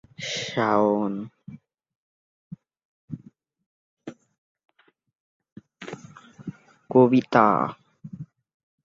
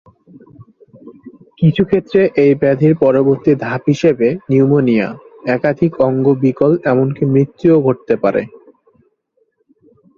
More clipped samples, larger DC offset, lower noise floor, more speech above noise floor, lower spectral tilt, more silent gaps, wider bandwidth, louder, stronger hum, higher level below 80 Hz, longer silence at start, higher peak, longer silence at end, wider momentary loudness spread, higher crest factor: neither; neither; about the same, -66 dBFS vs -63 dBFS; second, 45 dB vs 50 dB; second, -6 dB/octave vs -9 dB/octave; first, 1.95-2.51 s, 2.85-3.08 s, 3.66-3.97 s, 4.38-4.55 s, 5.15-5.40 s, 5.52-5.56 s vs none; about the same, 7.6 kHz vs 7.2 kHz; second, -22 LUFS vs -14 LUFS; neither; second, -68 dBFS vs -52 dBFS; second, 0.2 s vs 0.6 s; about the same, -2 dBFS vs 0 dBFS; second, 0.6 s vs 1.7 s; first, 27 LU vs 5 LU; first, 26 dB vs 14 dB